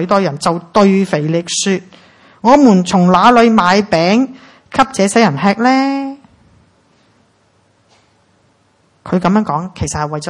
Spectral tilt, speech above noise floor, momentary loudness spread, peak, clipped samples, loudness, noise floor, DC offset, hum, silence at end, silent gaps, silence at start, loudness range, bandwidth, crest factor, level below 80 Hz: -5.5 dB/octave; 43 dB; 11 LU; 0 dBFS; 0.2%; -12 LUFS; -55 dBFS; under 0.1%; none; 0 s; none; 0 s; 10 LU; 11.5 kHz; 14 dB; -46 dBFS